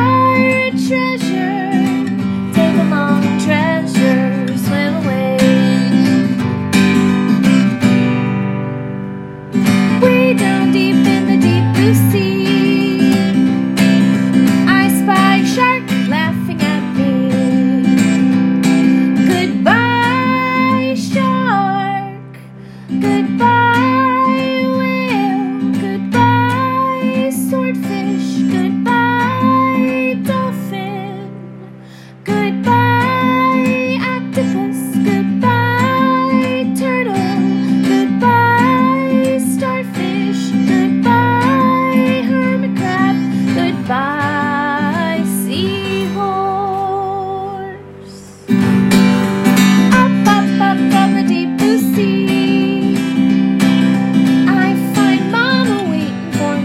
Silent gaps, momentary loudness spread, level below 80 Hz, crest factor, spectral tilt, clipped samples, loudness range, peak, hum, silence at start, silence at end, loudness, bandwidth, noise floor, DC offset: none; 7 LU; -52 dBFS; 12 dB; -6 dB/octave; under 0.1%; 4 LU; 0 dBFS; none; 0 s; 0 s; -13 LUFS; 16 kHz; -35 dBFS; under 0.1%